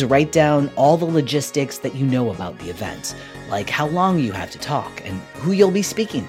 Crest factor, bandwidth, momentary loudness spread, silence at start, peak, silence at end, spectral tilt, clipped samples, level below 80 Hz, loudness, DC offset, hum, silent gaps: 18 dB; 16.5 kHz; 13 LU; 0 s; -2 dBFS; 0 s; -5.5 dB/octave; under 0.1%; -50 dBFS; -20 LUFS; under 0.1%; none; none